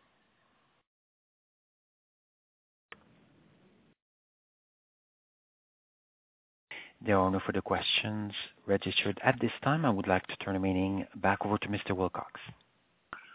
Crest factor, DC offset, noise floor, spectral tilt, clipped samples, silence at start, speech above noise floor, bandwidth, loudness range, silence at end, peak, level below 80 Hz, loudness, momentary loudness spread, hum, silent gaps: 26 dB; under 0.1%; -72 dBFS; -3.5 dB/octave; under 0.1%; 6.7 s; 40 dB; 4 kHz; 6 LU; 0 s; -8 dBFS; -58 dBFS; -31 LUFS; 18 LU; none; none